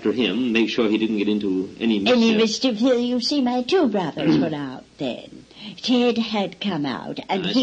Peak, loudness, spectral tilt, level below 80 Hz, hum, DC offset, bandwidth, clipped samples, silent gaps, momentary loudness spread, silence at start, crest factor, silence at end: -6 dBFS; -21 LUFS; -5 dB/octave; -62 dBFS; none; under 0.1%; 8.6 kHz; under 0.1%; none; 11 LU; 0 s; 14 dB; 0 s